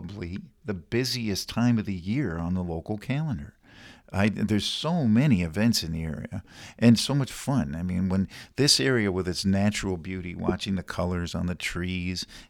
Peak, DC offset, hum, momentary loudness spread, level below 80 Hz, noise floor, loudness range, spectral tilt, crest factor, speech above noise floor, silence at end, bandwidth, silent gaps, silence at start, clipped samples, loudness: -6 dBFS; under 0.1%; none; 14 LU; -48 dBFS; -51 dBFS; 4 LU; -5 dB/octave; 20 dB; 25 dB; 0.05 s; 17 kHz; none; 0 s; under 0.1%; -26 LUFS